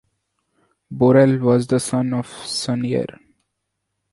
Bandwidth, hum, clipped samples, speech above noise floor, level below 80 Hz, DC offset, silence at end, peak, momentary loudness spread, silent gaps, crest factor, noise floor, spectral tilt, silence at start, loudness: 11.5 kHz; none; under 0.1%; 59 dB; -56 dBFS; under 0.1%; 1 s; -2 dBFS; 12 LU; none; 18 dB; -76 dBFS; -6 dB/octave; 0.9 s; -18 LUFS